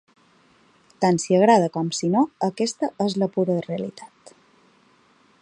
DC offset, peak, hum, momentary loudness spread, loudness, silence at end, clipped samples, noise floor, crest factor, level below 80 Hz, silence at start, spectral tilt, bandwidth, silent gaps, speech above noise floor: under 0.1%; -4 dBFS; none; 13 LU; -22 LUFS; 1.35 s; under 0.1%; -58 dBFS; 20 dB; -70 dBFS; 1 s; -5.5 dB/octave; 11 kHz; none; 37 dB